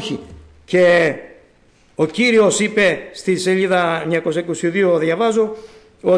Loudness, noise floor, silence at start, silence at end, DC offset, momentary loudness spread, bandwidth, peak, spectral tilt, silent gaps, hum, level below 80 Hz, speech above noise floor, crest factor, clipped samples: -16 LUFS; -53 dBFS; 0 s; 0 s; under 0.1%; 11 LU; 10.5 kHz; -4 dBFS; -4.5 dB/octave; none; none; -54 dBFS; 37 dB; 12 dB; under 0.1%